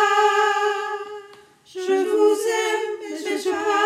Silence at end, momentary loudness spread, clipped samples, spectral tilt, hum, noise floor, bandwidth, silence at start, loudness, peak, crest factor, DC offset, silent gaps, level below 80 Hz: 0 s; 14 LU; under 0.1%; -1 dB/octave; none; -48 dBFS; 15.5 kHz; 0 s; -21 LUFS; -6 dBFS; 16 dB; under 0.1%; none; -74 dBFS